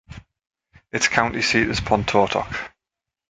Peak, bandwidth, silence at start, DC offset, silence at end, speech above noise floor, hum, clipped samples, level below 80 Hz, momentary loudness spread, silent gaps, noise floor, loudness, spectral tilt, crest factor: 0 dBFS; 9.6 kHz; 0.1 s; under 0.1%; 0.65 s; 66 dB; none; under 0.1%; -44 dBFS; 11 LU; none; -87 dBFS; -20 LUFS; -3.5 dB/octave; 22 dB